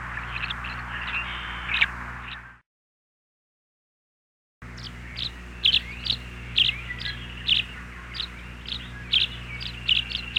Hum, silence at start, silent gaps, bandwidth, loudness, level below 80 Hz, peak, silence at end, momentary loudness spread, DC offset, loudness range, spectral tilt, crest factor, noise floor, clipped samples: 60 Hz at -45 dBFS; 0 s; 2.66-4.61 s; 16.5 kHz; -26 LUFS; -42 dBFS; -8 dBFS; 0 s; 16 LU; under 0.1%; 13 LU; -3 dB/octave; 22 dB; under -90 dBFS; under 0.1%